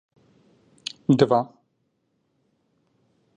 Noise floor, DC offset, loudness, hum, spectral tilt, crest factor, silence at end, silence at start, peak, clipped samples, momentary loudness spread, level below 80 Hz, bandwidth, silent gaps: -72 dBFS; under 0.1%; -21 LUFS; none; -7 dB/octave; 24 dB; 1.9 s; 1.1 s; -2 dBFS; under 0.1%; 18 LU; -64 dBFS; 10 kHz; none